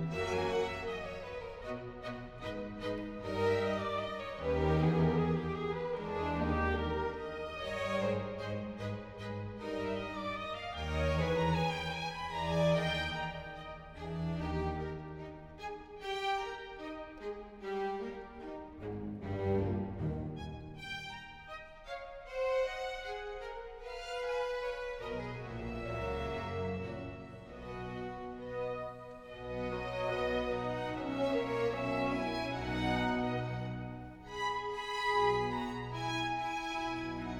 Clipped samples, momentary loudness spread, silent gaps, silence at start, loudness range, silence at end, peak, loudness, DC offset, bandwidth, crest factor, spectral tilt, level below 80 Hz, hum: under 0.1%; 13 LU; none; 0 s; 7 LU; 0 s; -18 dBFS; -37 LUFS; under 0.1%; 12.5 kHz; 18 dB; -6.5 dB/octave; -50 dBFS; none